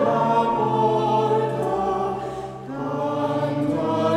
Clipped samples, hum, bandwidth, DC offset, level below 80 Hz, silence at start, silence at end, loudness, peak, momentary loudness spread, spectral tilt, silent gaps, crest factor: under 0.1%; none; 13.5 kHz; under 0.1%; -54 dBFS; 0 s; 0 s; -22 LUFS; -6 dBFS; 10 LU; -7.5 dB/octave; none; 16 dB